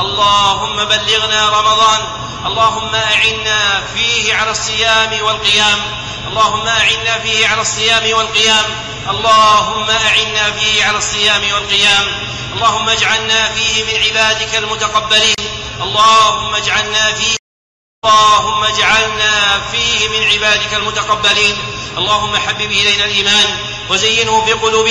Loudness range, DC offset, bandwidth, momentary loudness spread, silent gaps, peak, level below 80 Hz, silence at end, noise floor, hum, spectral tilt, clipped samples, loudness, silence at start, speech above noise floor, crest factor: 1 LU; under 0.1%; 11 kHz; 6 LU; 17.39-18.02 s; -2 dBFS; -38 dBFS; 0 s; under -90 dBFS; none; -1 dB/octave; under 0.1%; -11 LUFS; 0 s; over 77 dB; 12 dB